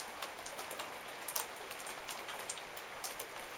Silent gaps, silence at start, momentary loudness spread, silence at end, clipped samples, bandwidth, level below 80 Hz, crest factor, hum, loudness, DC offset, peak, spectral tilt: none; 0 s; 5 LU; 0 s; under 0.1%; 18 kHz; -74 dBFS; 30 dB; none; -43 LUFS; under 0.1%; -16 dBFS; 0 dB/octave